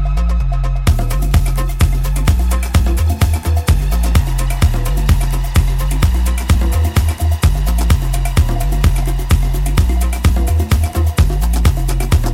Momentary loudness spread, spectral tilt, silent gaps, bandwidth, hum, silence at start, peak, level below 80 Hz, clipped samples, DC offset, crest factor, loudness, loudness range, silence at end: 2 LU; -5.5 dB/octave; none; 16.5 kHz; none; 0 s; 0 dBFS; -14 dBFS; under 0.1%; under 0.1%; 12 dB; -16 LUFS; 0 LU; 0 s